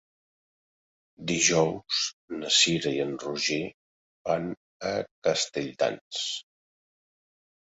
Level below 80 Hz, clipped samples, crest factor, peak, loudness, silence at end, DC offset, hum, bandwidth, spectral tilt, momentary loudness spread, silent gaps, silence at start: -66 dBFS; under 0.1%; 22 dB; -8 dBFS; -27 LUFS; 1.25 s; under 0.1%; none; 8.2 kHz; -2.5 dB/octave; 15 LU; 2.13-2.28 s, 3.74-4.25 s, 4.57-4.80 s, 5.11-5.22 s, 6.01-6.11 s; 1.2 s